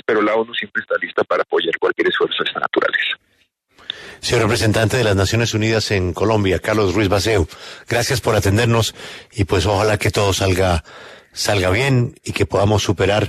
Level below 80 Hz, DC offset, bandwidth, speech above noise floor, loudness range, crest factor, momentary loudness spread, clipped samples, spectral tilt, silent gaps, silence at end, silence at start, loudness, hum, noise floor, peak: -38 dBFS; under 0.1%; 13.5 kHz; 44 dB; 2 LU; 16 dB; 8 LU; under 0.1%; -5 dB/octave; none; 0 s; 0.1 s; -18 LUFS; none; -62 dBFS; -2 dBFS